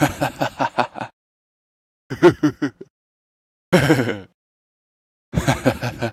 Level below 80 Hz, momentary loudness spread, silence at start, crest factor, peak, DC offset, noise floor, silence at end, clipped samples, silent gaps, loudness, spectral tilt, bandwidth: -44 dBFS; 14 LU; 0 s; 22 dB; 0 dBFS; under 0.1%; under -90 dBFS; 0 s; under 0.1%; 1.13-2.10 s, 2.90-3.72 s, 4.34-5.32 s; -20 LUFS; -6 dB/octave; 15.5 kHz